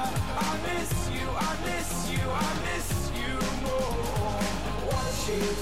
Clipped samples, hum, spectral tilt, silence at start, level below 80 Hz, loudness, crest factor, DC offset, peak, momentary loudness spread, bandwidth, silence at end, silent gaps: under 0.1%; none; -4.5 dB/octave; 0 s; -38 dBFS; -30 LUFS; 10 dB; 1%; -18 dBFS; 2 LU; 16 kHz; 0 s; none